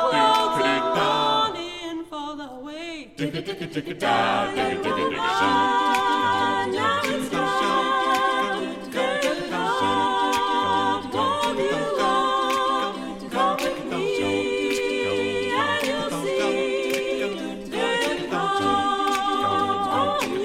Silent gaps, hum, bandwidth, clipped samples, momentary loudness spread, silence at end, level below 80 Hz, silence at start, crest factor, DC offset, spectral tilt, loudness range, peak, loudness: none; none; 16 kHz; under 0.1%; 10 LU; 0 s; -54 dBFS; 0 s; 16 dB; under 0.1%; -3.5 dB/octave; 4 LU; -8 dBFS; -23 LUFS